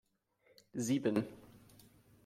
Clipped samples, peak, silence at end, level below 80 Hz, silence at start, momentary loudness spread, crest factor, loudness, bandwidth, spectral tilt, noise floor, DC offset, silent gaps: under 0.1%; -20 dBFS; 0.7 s; -76 dBFS; 0.75 s; 15 LU; 20 dB; -37 LUFS; 16 kHz; -5.5 dB/octave; -73 dBFS; under 0.1%; none